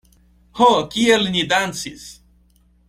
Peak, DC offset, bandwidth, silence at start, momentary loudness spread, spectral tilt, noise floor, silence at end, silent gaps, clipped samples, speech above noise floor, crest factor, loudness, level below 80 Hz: -2 dBFS; under 0.1%; 16 kHz; 0.55 s; 23 LU; -3.5 dB/octave; -56 dBFS; 0.75 s; none; under 0.1%; 38 dB; 18 dB; -17 LUFS; -52 dBFS